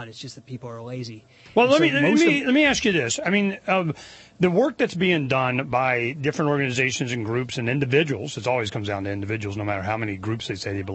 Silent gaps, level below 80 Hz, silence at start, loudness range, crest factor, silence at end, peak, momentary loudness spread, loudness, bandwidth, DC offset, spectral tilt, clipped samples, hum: none; -56 dBFS; 0 s; 5 LU; 18 dB; 0 s; -4 dBFS; 16 LU; -22 LUFS; 8.6 kHz; under 0.1%; -5 dB/octave; under 0.1%; none